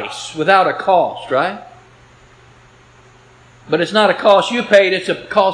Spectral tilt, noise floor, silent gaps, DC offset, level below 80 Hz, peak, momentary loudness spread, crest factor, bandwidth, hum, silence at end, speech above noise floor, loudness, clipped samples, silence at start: -4 dB/octave; -46 dBFS; none; under 0.1%; -58 dBFS; 0 dBFS; 9 LU; 16 dB; 10.5 kHz; none; 0 s; 32 dB; -14 LUFS; under 0.1%; 0 s